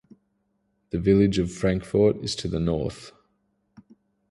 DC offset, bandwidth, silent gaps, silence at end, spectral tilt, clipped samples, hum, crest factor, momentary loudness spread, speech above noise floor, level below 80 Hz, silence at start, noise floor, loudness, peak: under 0.1%; 11.5 kHz; none; 1.2 s; -6.5 dB/octave; under 0.1%; none; 18 dB; 12 LU; 49 dB; -44 dBFS; 0.95 s; -72 dBFS; -24 LUFS; -8 dBFS